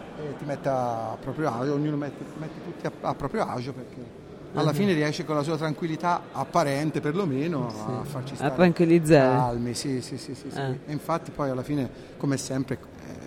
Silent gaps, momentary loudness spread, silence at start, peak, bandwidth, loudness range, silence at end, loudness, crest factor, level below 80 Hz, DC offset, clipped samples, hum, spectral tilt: none; 14 LU; 0 s; -6 dBFS; 16 kHz; 7 LU; 0 s; -27 LUFS; 20 dB; -54 dBFS; under 0.1%; under 0.1%; none; -6.5 dB/octave